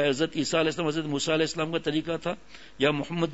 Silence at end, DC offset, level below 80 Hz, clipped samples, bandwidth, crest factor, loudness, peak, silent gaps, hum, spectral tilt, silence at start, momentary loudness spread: 0 s; 0.4%; -58 dBFS; under 0.1%; 8 kHz; 18 dB; -27 LUFS; -10 dBFS; none; none; -4.5 dB/octave; 0 s; 6 LU